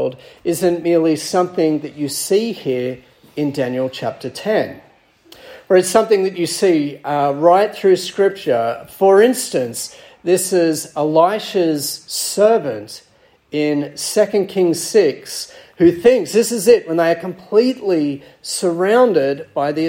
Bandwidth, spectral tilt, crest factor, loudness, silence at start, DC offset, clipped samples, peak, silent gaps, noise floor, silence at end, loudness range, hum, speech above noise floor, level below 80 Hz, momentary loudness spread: 16.5 kHz; -4.5 dB/octave; 16 dB; -17 LUFS; 0 s; under 0.1%; under 0.1%; 0 dBFS; none; -47 dBFS; 0 s; 5 LU; none; 31 dB; -60 dBFS; 12 LU